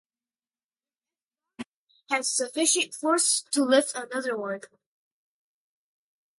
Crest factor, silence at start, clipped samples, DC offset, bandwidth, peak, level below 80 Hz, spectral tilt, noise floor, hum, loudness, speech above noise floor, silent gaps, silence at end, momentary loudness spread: 20 dB; 1.6 s; under 0.1%; under 0.1%; 12 kHz; -8 dBFS; -82 dBFS; -0.5 dB/octave; under -90 dBFS; none; -25 LUFS; over 64 dB; 1.67-1.87 s; 1.7 s; 21 LU